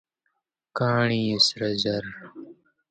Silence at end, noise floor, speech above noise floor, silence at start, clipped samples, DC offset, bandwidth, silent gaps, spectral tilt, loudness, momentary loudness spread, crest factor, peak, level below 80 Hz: 0.4 s; -77 dBFS; 52 dB; 0.75 s; under 0.1%; under 0.1%; 9.2 kHz; none; -4.5 dB/octave; -23 LUFS; 19 LU; 20 dB; -8 dBFS; -62 dBFS